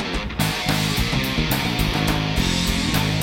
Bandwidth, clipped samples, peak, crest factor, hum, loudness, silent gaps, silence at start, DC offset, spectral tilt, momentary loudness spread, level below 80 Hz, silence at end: 16.5 kHz; under 0.1%; -6 dBFS; 16 dB; none; -21 LUFS; none; 0 s; under 0.1%; -4 dB/octave; 2 LU; -30 dBFS; 0 s